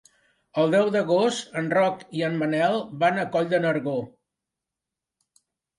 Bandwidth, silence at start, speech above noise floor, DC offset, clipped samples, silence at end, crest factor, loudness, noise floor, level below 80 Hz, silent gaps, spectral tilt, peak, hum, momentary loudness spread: 11.5 kHz; 0.55 s; 64 dB; under 0.1%; under 0.1%; 1.7 s; 16 dB; -24 LUFS; -87 dBFS; -70 dBFS; none; -5.5 dB/octave; -10 dBFS; none; 8 LU